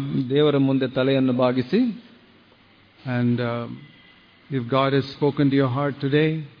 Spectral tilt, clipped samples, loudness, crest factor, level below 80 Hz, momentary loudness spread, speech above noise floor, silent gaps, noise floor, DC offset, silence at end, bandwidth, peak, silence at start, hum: -9.5 dB/octave; under 0.1%; -22 LUFS; 16 dB; -62 dBFS; 11 LU; 33 dB; none; -54 dBFS; under 0.1%; 0.1 s; 5.2 kHz; -6 dBFS; 0 s; none